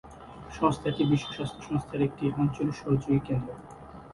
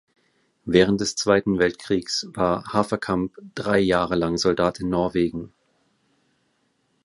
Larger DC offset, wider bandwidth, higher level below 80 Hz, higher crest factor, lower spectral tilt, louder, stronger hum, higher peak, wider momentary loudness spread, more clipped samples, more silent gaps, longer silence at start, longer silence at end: neither; about the same, 11.5 kHz vs 11.5 kHz; about the same, -52 dBFS vs -48 dBFS; about the same, 20 dB vs 22 dB; first, -7.5 dB/octave vs -5 dB/octave; second, -29 LUFS vs -22 LUFS; neither; second, -10 dBFS vs -2 dBFS; first, 18 LU vs 8 LU; neither; neither; second, 0.05 s vs 0.65 s; second, 0 s vs 1.55 s